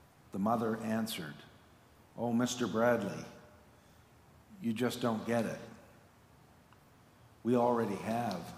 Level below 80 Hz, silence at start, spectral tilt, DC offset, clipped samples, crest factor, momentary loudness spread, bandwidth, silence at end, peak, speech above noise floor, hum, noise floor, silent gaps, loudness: -72 dBFS; 0.35 s; -5.5 dB/octave; under 0.1%; under 0.1%; 18 dB; 16 LU; 15.5 kHz; 0 s; -18 dBFS; 28 dB; none; -62 dBFS; none; -34 LUFS